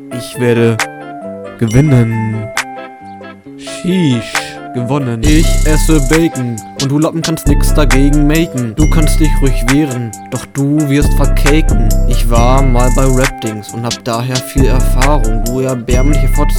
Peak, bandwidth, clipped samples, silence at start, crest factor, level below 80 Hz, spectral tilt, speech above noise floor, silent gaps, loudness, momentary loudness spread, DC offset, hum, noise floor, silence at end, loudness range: 0 dBFS; 17.5 kHz; 0.4%; 0 s; 10 dB; -14 dBFS; -5.5 dB/octave; 21 dB; none; -13 LUFS; 11 LU; under 0.1%; none; -30 dBFS; 0 s; 3 LU